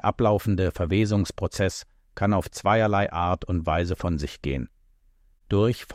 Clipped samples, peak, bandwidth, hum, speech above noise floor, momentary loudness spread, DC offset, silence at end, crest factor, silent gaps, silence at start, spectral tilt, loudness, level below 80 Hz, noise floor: under 0.1%; -8 dBFS; 15.5 kHz; none; 36 dB; 8 LU; under 0.1%; 0 s; 16 dB; none; 0.05 s; -6.5 dB/octave; -25 LUFS; -40 dBFS; -60 dBFS